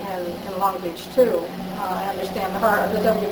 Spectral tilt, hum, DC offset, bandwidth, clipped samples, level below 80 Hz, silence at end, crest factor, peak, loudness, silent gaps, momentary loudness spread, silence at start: -5.5 dB/octave; none; under 0.1%; over 20 kHz; under 0.1%; -52 dBFS; 0 s; 16 dB; -6 dBFS; -23 LUFS; none; 9 LU; 0 s